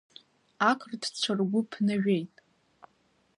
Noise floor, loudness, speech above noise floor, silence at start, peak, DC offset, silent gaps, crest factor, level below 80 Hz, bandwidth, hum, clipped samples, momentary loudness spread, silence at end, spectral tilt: -69 dBFS; -29 LUFS; 41 dB; 0.6 s; -10 dBFS; under 0.1%; none; 20 dB; -76 dBFS; 11 kHz; none; under 0.1%; 5 LU; 1.1 s; -5 dB/octave